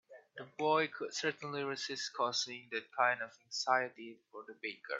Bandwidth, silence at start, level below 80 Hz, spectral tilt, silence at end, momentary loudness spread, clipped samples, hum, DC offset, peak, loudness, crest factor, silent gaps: 8 kHz; 0.1 s; -90 dBFS; -2.5 dB/octave; 0 s; 18 LU; under 0.1%; none; under 0.1%; -16 dBFS; -36 LUFS; 22 dB; none